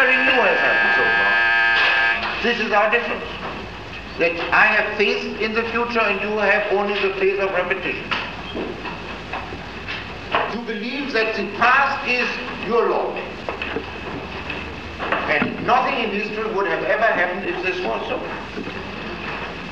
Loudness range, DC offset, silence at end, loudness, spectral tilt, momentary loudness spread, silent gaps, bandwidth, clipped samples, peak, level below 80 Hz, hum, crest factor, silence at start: 7 LU; 0.5%; 0 s; -20 LUFS; -4.5 dB/octave; 14 LU; none; 9 kHz; under 0.1%; -2 dBFS; -46 dBFS; none; 18 dB; 0 s